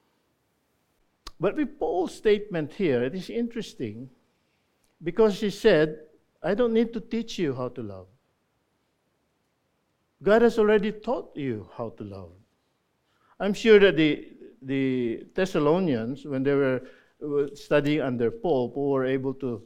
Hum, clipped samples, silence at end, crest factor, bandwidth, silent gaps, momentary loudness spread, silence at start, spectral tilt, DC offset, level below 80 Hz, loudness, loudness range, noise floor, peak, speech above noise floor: none; under 0.1%; 0.05 s; 20 dB; 11.5 kHz; none; 16 LU; 1.25 s; -6.5 dB/octave; under 0.1%; -54 dBFS; -25 LUFS; 6 LU; -73 dBFS; -6 dBFS; 48 dB